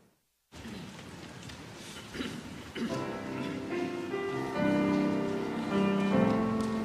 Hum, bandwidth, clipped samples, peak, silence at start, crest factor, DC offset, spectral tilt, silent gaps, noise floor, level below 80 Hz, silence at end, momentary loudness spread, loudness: none; 14.5 kHz; under 0.1%; -14 dBFS; 0.55 s; 18 dB; under 0.1%; -6.5 dB/octave; none; -70 dBFS; -60 dBFS; 0 s; 17 LU; -32 LUFS